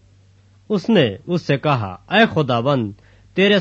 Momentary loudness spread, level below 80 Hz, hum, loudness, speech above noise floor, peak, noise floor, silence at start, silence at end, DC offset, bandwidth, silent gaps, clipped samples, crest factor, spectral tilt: 9 LU; -56 dBFS; none; -18 LUFS; 34 dB; -2 dBFS; -51 dBFS; 0.7 s; 0 s; under 0.1%; 7.6 kHz; none; under 0.1%; 16 dB; -7 dB/octave